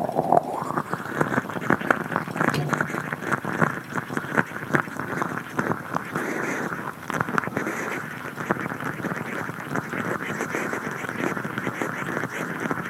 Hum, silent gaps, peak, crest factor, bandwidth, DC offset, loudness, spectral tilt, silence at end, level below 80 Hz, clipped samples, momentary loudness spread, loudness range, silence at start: none; none; 0 dBFS; 26 dB; 16.5 kHz; under 0.1%; -27 LUFS; -5.5 dB/octave; 0 s; -62 dBFS; under 0.1%; 7 LU; 3 LU; 0 s